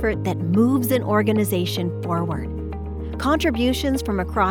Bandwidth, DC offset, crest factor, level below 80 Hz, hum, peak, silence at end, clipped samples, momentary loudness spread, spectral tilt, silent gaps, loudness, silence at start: over 20 kHz; under 0.1%; 16 dB; -36 dBFS; none; -6 dBFS; 0 s; under 0.1%; 11 LU; -6 dB/octave; none; -22 LUFS; 0 s